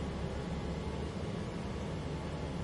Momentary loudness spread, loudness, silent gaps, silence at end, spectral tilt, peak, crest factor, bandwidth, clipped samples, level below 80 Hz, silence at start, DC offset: 1 LU; -39 LUFS; none; 0 s; -6.5 dB/octave; -26 dBFS; 14 dB; 11.5 kHz; under 0.1%; -46 dBFS; 0 s; under 0.1%